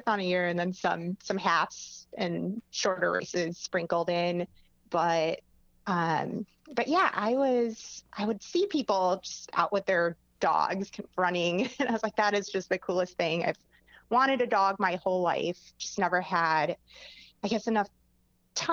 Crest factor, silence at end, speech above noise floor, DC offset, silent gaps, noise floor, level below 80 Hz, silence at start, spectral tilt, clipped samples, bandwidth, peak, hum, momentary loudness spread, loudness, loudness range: 20 dB; 0 s; 40 dB; under 0.1%; none; -69 dBFS; -68 dBFS; 0.05 s; -4.5 dB/octave; under 0.1%; 7.6 kHz; -10 dBFS; none; 11 LU; -29 LUFS; 2 LU